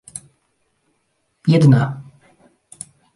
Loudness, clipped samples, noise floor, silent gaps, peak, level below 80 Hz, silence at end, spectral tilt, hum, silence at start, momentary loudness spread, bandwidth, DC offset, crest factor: -15 LUFS; under 0.1%; -68 dBFS; none; -2 dBFS; -58 dBFS; 1.15 s; -7.5 dB/octave; none; 0.15 s; 24 LU; 11.5 kHz; under 0.1%; 18 dB